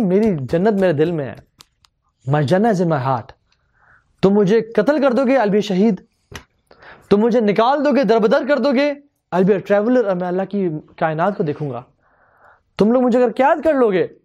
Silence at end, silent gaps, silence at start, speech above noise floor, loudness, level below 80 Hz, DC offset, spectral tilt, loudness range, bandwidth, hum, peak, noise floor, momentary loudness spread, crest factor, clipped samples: 0.15 s; none; 0 s; 45 dB; -17 LUFS; -54 dBFS; under 0.1%; -7.5 dB/octave; 4 LU; 10 kHz; none; 0 dBFS; -61 dBFS; 9 LU; 16 dB; under 0.1%